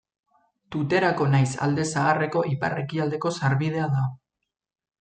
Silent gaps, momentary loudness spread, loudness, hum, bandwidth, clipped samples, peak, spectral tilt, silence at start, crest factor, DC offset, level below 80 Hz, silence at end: none; 6 LU; -24 LUFS; none; 9.2 kHz; under 0.1%; -8 dBFS; -6.5 dB/octave; 0.7 s; 16 dB; under 0.1%; -62 dBFS; 0.85 s